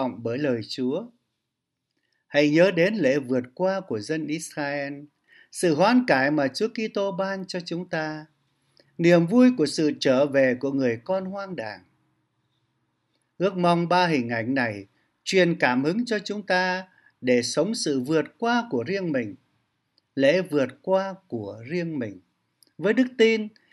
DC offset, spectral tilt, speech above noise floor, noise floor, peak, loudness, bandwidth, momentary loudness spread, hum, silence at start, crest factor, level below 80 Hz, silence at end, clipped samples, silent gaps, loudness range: under 0.1%; -5.5 dB/octave; 58 dB; -82 dBFS; -4 dBFS; -24 LUFS; 12 kHz; 13 LU; none; 0 s; 20 dB; -74 dBFS; 0.25 s; under 0.1%; none; 5 LU